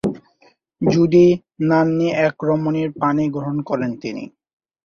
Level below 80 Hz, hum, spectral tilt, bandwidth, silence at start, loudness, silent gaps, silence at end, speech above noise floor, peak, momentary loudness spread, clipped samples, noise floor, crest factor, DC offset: -54 dBFS; none; -8 dB/octave; 7 kHz; 0.05 s; -18 LUFS; none; 0.6 s; 39 dB; -2 dBFS; 15 LU; under 0.1%; -57 dBFS; 16 dB; under 0.1%